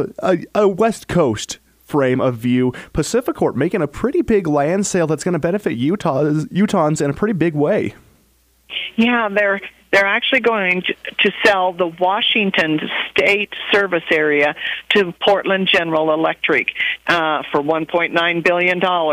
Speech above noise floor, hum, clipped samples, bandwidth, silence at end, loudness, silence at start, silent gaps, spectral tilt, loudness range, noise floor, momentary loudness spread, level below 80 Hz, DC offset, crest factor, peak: 40 dB; none; under 0.1%; 15.5 kHz; 0 s; -17 LUFS; 0 s; none; -4.5 dB/octave; 3 LU; -57 dBFS; 5 LU; -48 dBFS; under 0.1%; 18 dB; 0 dBFS